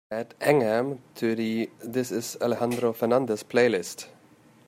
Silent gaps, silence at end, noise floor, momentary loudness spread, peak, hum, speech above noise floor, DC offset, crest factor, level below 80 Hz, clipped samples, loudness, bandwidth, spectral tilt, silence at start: none; 0.55 s; -56 dBFS; 10 LU; -6 dBFS; none; 30 dB; under 0.1%; 20 dB; -72 dBFS; under 0.1%; -26 LUFS; 16 kHz; -5 dB/octave; 0.1 s